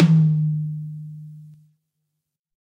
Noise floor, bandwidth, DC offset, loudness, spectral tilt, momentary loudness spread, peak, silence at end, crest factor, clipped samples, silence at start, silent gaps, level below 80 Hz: -80 dBFS; 5.2 kHz; under 0.1%; -21 LUFS; -9 dB/octave; 23 LU; -4 dBFS; 1.2 s; 18 dB; under 0.1%; 0 s; none; -66 dBFS